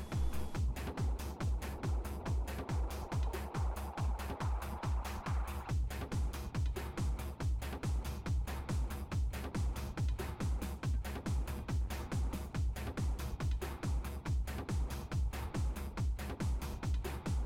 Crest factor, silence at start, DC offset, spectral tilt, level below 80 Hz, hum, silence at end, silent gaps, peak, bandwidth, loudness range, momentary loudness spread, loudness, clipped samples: 12 dB; 0 s; under 0.1%; -6 dB/octave; -40 dBFS; none; 0 s; none; -26 dBFS; 16.5 kHz; 0 LU; 1 LU; -40 LUFS; under 0.1%